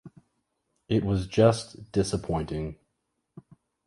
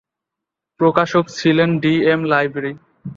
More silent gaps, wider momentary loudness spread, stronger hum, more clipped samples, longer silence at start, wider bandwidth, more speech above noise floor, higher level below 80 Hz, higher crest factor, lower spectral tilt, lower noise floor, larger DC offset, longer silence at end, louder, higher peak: neither; about the same, 12 LU vs 10 LU; neither; neither; second, 0.05 s vs 0.8 s; first, 11.5 kHz vs 7.6 kHz; second, 53 dB vs 67 dB; first, -46 dBFS vs -58 dBFS; first, 24 dB vs 18 dB; about the same, -6.5 dB/octave vs -6.5 dB/octave; second, -79 dBFS vs -83 dBFS; neither; first, 0.45 s vs 0.05 s; second, -27 LUFS vs -16 LUFS; second, -6 dBFS vs 0 dBFS